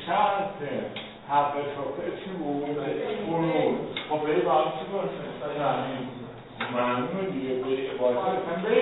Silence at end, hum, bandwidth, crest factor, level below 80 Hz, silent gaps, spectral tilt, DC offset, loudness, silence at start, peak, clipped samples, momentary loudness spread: 0 s; none; 4.1 kHz; 18 dB; -62 dBFS; none; -10 dB/octave; under 0.1%; -28 LUFS; 0 s; -10 dBFS; under 0.1%; 9 LU